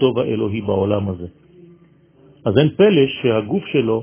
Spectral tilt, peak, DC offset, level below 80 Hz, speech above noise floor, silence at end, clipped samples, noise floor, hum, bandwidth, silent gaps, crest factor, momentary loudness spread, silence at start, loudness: -11.5 dB/octave; 0 dBFS; under 0.1%; -46 dBFS; 34 dB; 0 s; under 0.1%; -51 dBFS; none; 3.6 kHz; none; 18 dB; 13 LU; 0 s; -18 LUFS